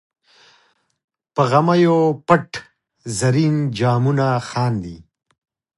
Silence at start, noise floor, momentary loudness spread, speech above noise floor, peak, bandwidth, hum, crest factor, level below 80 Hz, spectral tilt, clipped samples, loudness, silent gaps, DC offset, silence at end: 1.35 s; -60 dBFS; 15 LU; 43 dB; 0 dBFS; 11.5 kHz; none; 20 dB; -54 dBFS; -6.5 dB/octave; under 0.1%; -18 LUFS; none; under 0.1%; 0.8 s